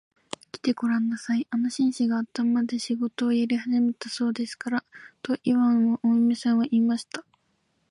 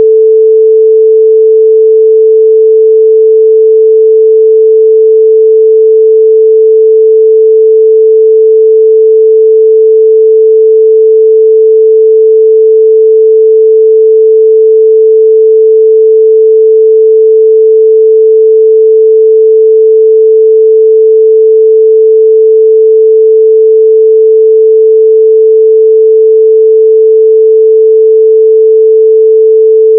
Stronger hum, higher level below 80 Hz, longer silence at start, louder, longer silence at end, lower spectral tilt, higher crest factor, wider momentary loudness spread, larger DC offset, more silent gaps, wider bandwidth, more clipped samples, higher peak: neither; first, -74 dBFS vs under -90 dBFS; first, 0.55 s vs 0 s; second, -25 LUFS vs -4 LUFS; first, 0.7 s vs 0 s; second, -5 dB/octave vs -11 dB/octave; first, 14 dB vs 4 dB; first, 9 LU vs 0 LU; neither; neither; first, 11 kHz vs 0.5 kHz; second, under 0.1% vs 0.4%; second, -10 dBFS vs 0 dBFS